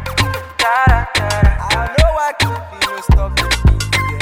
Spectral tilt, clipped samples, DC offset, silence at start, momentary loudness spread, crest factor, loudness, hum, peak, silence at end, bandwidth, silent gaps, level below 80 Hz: -4.5 dB/octave; under 0.1%; under 0.1%; 0 s; 5 LU; 14 dB; -15 LUFS; none; 0 dBFS; 0 s; 16.5 kHz; none; -18 dBFS